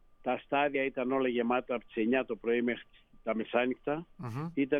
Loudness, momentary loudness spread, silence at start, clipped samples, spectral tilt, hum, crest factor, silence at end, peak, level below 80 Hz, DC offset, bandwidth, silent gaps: -32 LUFS; 8 LU; 0.25 s; under 0.1%; -8 dB/octave; none; 18 dB; 0 s; -16 dBFS; -64 dBFS; under 0.1%; 6.4 kHz; none